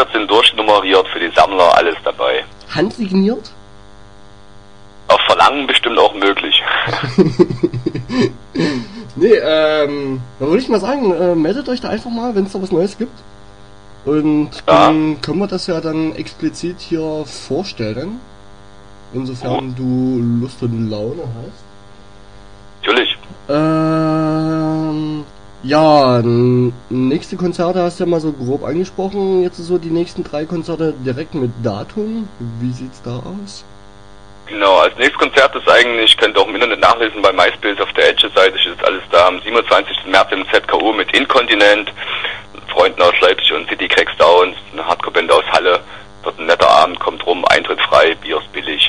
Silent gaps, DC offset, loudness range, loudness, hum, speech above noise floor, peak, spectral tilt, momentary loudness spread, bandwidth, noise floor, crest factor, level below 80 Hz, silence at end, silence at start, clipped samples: none; 1%; 9 LU; -14 LUFS; 50 Hz at -45 dBFS; 27 dB; 0 dBFS; -5 dB/octave; 13 LU; 11 kHz; -41 dBFS; 14 dB; -46 dBFS; 0 s; 0 s; under 0.1%